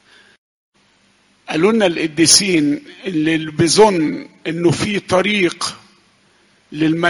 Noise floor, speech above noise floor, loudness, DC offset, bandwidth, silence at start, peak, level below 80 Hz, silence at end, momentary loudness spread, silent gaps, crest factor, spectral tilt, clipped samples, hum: -56 dBFS; 41 dB; -15 LUFS; under 0.1%; 11.5 kHz; 1.5 s; 0 dBFS; -52 dBFS; 0 s; 14 LU; none; 18 dB; -3.5 dB/octave; under 0.1%; none